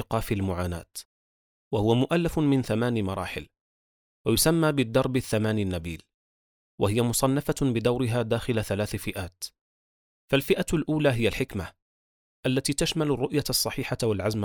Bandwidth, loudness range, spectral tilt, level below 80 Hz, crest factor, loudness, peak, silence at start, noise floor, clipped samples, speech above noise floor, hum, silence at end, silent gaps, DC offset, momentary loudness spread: over 20 kHz; 2 LU; -5 dB/octave; -48 dBFS; 18 dB; -26 LUFS; -8 dBFS; 0 s; under -90 dBFS; under 0.1%; over 64 dB; none; 0 s; 1.05-1.71 s, 3.60-4.25 s, 6.14-6.78 s, 9.61-10.28 s, 11.82-12.43 s; under 0.1%; 11 LU